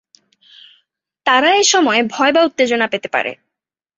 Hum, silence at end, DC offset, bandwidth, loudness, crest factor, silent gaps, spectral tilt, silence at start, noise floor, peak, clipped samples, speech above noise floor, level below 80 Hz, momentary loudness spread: none; 0.65 s; under 0.1%; 8.2 kHz; -14 LUFS; 16 dB; none; -1.5 dB/octave; 1.25 s; -82 dBFS; 0 dBFS; under 0.1%; 67 dB; -64 dBFS; 9 LU